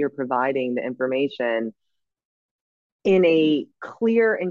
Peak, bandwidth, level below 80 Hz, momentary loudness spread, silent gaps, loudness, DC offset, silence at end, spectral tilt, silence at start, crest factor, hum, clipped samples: -8 dBFS; 7 kHz; -72 dBFS; 10 LU; 2.25-2.99 s; -22 LUFS; under 0.1%; 0 s; -7.5 dB/octave; 0 s; 14 dB; none; under 0.1%